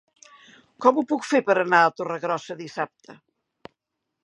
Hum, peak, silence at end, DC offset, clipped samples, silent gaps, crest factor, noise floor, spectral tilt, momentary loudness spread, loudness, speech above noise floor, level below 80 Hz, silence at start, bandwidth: none; -2 dBFS; 1.1 s; under 0.1%; under 0.1%; none; 22 dB; -82 dBFS; -5 dB/octave; 13 LU; -23 LUFS; 59 dB; -80 dBFS; 0.8 s; 11 kHz